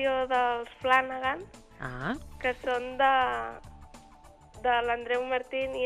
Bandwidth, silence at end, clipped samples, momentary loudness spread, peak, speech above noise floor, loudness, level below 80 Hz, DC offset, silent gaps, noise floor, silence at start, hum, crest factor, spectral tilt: 13 kHz; 0 s; under 0.1%; 14 LU; -10 dBFS; 25 dB; -29 LUFS; -54 dBFS; under 0.1%; none; -54 dBFS; 0 s; none; 20 dB; -4.5 dB/octave